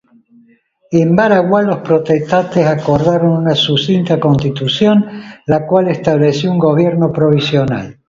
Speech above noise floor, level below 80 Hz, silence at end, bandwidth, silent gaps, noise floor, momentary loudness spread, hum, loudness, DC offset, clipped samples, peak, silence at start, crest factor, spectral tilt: 40 dB; -46 dBFS; 0.15 s; 7.6 kHz; none; -51 dBFS; 4 LU; none; -12 LUFS; under 0.1%; under 0.1%; 0 dBFS; 0.9 s; 12 dB; -7 dB/octave